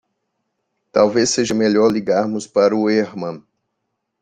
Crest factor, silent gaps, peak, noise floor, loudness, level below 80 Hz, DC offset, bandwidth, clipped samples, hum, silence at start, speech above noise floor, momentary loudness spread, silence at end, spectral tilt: 16 dB; none; -2 dBFS; -75 dBFS; -17 LUFS; -58 dBFS; under 0.1%; 9.6 kHz; under 0.1%; none; 0.95 s; 59 dB; 11 LU; 0.85 s; -4.5 dB/octave